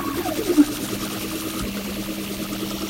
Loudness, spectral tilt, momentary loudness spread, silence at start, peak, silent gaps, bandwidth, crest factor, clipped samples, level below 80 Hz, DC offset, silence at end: -24 LUFS; -4 dB/octave; 9 LU; 0 s; -4 dBFS; none; 16 kHz; 22 dB; under 0.1%; -44 dBFS; under 0.1%; 0 s